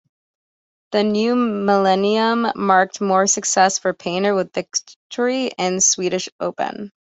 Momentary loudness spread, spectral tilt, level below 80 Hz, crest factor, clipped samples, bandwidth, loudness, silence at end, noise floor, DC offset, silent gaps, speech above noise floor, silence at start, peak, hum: 9 LU; -3 dB/octave; -64 dBFS; 18 dB; under 0.1%; 8.4 kHz; -18 LUFS; 0.15 s; under -90 dBFS; under 0.1%; 4.96-5.10 s, 6.32-6.39 s; over 71 dB; 0.9 s; -2 dBFS; none